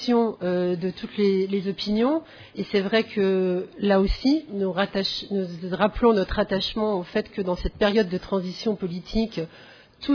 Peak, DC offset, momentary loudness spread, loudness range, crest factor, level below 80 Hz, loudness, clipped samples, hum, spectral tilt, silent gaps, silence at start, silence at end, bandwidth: -8 dBFS; under 0.1%; 8 LU; 2 LU; 16 dB; -40 dBFS; -24 LUFS; under 0.1%; none; -7 dB/octave; none; 0 s; 0 s; 5.4 kHz